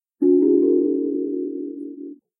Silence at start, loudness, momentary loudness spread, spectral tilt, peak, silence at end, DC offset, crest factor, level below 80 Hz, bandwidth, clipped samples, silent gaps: 0.2 s; -20 LUFS; 18 LU; -13.5 dB/octave; -8 dBFS; 0.25 s; under 0.1%; 14 dB; -78 dBFS; 1.1 kHz; under 0.1%; none